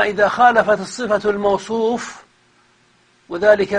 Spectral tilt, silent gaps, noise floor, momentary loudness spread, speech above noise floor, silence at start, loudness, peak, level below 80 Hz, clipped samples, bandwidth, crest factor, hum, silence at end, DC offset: -4.5 dB/octave; none; -56 dBFS; 11 LU; 40 dB; 0 s; -17 LUFS; 0 dBFS; -54 dBFS; under 0.1%; 10 kHz; 18 dB; none; 0 s; under 0.1%